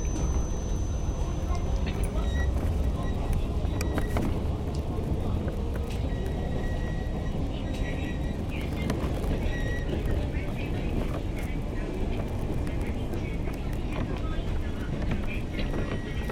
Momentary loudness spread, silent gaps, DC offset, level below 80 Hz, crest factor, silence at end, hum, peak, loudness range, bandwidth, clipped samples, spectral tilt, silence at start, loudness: 3 LU; none; under 0.1%; -30 dBFS; 14 dB; 0 s; none; -14 dBFS; 3 LU; 17 kHz; under 0.1%; -6.5 dB/octave; 0 s; -31 LUFS